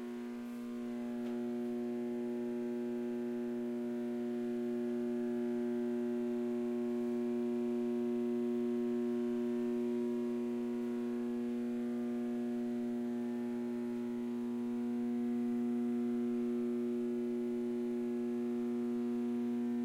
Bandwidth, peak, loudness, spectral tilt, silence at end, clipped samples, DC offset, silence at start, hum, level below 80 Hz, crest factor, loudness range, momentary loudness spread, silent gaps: 10.5 kHz; -28 dBFS; -37 LUFS; -7 dB/octave; 0 s; under 0.1%; under 0.1%; 0 s; none; -78 dBFS; 8 dB; 3 LU; 3 LU; none